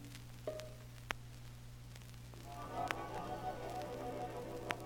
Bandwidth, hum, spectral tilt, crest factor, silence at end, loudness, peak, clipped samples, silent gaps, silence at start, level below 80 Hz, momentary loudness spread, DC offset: 17.5 kHz; 60 Hz at -55 dBFS; -5 dB/octave; 30 dB; 0 s; -46 LUFS; -16 dBFS; under 0.1%; none; 0 s; -58 dBFS; 12 LU; under 0.1%